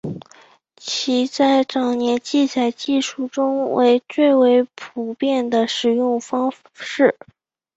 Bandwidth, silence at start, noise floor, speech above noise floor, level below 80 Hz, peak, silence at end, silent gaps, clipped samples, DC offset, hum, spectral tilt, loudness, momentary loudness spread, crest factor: 8 kHz; 0.05 s; -50 dBFS; 32 dB; -64 dBFS; -2 dBFS; 0.65 s; none; under 0.1%; under 0.1%; none; -4 dB/octave; -19 LUFS; 12 LU; 16 dB